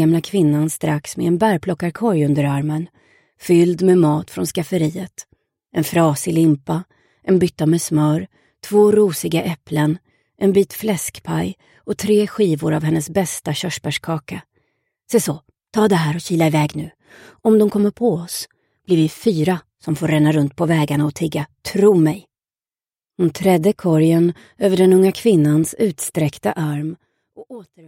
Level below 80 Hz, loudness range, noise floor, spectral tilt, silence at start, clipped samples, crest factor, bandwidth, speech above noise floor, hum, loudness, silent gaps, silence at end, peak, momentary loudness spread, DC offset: -56 dBFS; 4 LU; under -90 dBFS; -6.5 dB/octave; 0 s; under 0.1%; 16 dB; 16.5 kHz; over 73 dB; none; -18 LUFS; none; 0.25 s; -2 dBFS; 12 LU; under 0.1%